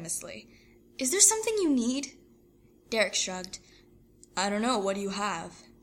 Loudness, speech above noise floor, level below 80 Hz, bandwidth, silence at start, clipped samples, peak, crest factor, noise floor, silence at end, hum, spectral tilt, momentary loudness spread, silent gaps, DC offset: -27 LUFS; 32 dB; -64 dBFS; 16.5 kHz; 0 s; under 0.1%; -6 dBFS; 24 dB; -60 dBFS; 0.2 s; none; -2 dB/octave; 23 LU; none; under 0.1%